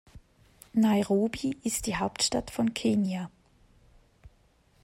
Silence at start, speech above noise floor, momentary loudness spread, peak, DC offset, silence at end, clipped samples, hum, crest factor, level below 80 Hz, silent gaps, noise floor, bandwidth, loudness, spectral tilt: 0.15 s; 37 dB; 7 LU; -14 dBFS; under 0.1%; 0.55 s; under 0.1%; none; 16 dB; -54 dBFS; none; -64 dBFS; 16 kHz; -28 LUFS; -4.5 dB/octave